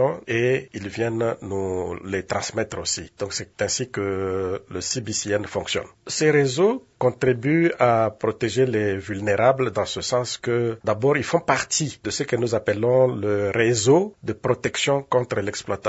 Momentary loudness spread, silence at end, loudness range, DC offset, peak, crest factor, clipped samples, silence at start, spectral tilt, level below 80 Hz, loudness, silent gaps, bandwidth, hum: 9 LU; 0 s; 5 LU; under 0.1%; -2 dBFS; 20 dB; under 0.1%; 0 s; -4.5 dB/octave; -58 dBFS; -23 LUFS; none; 8 kHz; none